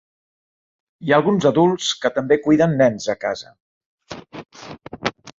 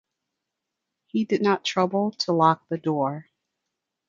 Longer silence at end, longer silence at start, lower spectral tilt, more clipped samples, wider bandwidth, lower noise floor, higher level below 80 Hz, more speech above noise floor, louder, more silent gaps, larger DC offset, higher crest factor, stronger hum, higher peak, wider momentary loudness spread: second, 0.1 s vs 0.85 s; second, 1 s vs 1.15 s; about the same, -5.5 dB/octave vs -5.5 dB/octave; neither; about the same, 7.8 kHz vs 7.6 kHz; second, -37 dBFS vs -84 dBFS; first, -56 dBFS vs -74 dBFS; second, 20 dB vs 60 dB; first, -18 LUFS vs -24 LUFS; first, 3.60-3.98 s vs none; neither; about the same, 18 dB vs 20 dB; neither; first, -2 dBFS vs -6 dBFS; first, 22 LU vs 8 LU